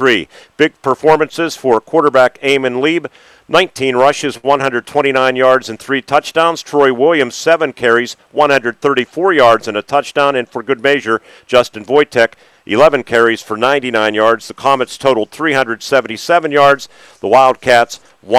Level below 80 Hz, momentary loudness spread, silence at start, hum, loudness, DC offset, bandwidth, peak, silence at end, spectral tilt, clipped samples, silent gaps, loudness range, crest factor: -54 dBFS; 7 LU; 0 s; none; -13 LUFS; under 0.1%; 15 kHz; 0 dBFS; 0 s; -4 dB/octave; 0.5%; none; 1 LU; 12 dB